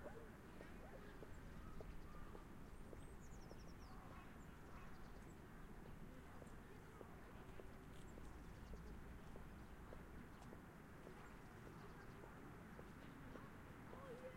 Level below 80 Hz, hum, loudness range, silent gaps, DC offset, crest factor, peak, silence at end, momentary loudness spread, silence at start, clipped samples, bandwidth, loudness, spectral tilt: -62 dBFS; none; 1 LU; none; under 0.1%; 16 dB; -40 dBFS; 0 s; 2 LU; 0 s; under 0.1%; 16 kHz; -60 LUFS; -6 dB/octave